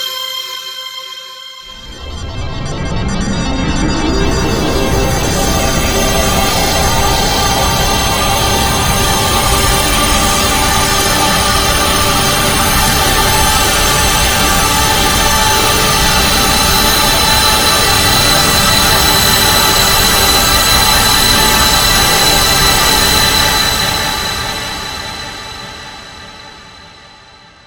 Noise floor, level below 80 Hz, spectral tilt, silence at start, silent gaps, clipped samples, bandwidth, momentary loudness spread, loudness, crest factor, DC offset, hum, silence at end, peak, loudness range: -40 dBFS; -22 dBFS; -2.5 dB/octave; 0 s; none; under 0.1%; over 20 kHz; 15 LU; -10 LUFS; 12 dB; under 0.1%; none; 0.8 s; 0 dBFS; 10 LU